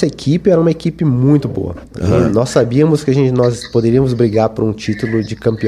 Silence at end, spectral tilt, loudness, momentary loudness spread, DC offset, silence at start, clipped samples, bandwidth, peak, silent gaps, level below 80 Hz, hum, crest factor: 0 s; -7.5 dB/octave; -14 LUFS; 6 LU; under 0.1%; 0 s; under 0.1%; 12 kHz; 0 dBFS; none; -38 dBFS; none; 12 dB